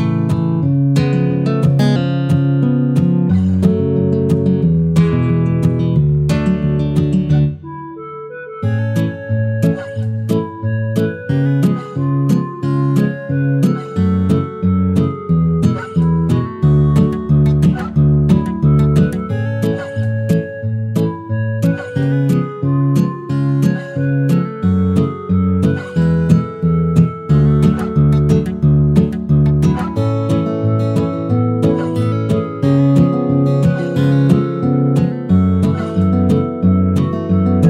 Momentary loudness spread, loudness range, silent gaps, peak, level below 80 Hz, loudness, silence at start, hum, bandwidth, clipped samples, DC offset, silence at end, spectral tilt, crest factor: 6 LU; 4 LU; none; 0 dBFS; -34 dBFS; -15 LUFS; 0 s; none; 11 kHz; under 0.1%; under 0.1%; 0 s; -9 dB/octave; 14 dB